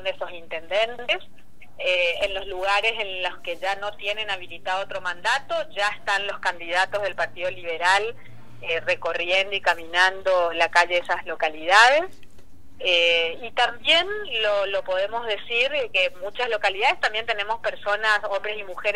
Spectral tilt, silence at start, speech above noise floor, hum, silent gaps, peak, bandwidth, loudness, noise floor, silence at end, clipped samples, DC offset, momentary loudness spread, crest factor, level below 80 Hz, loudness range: -1.5 dB/octave; 0 s; 25 dB; none; none; 0 dBFS; 15.5 kHz; -23 LUFS; -48 dBFS; 0 s; under 0.1%; 2%; 10 LU; 24 dB; -56 dBFS; 6 LU